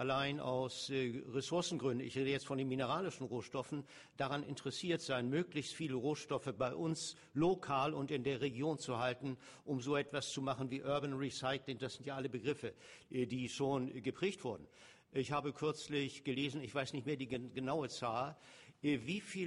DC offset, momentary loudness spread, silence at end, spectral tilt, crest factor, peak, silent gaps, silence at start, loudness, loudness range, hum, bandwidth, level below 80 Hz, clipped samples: under 0.1%; 7 LU; 0 s; -5 dB/octave; 16 dB; -24 dBFS; none; 0 s; -40 LUFS; 3 LU; none; 11.5 kHz; -74 dBFS; under 0.1%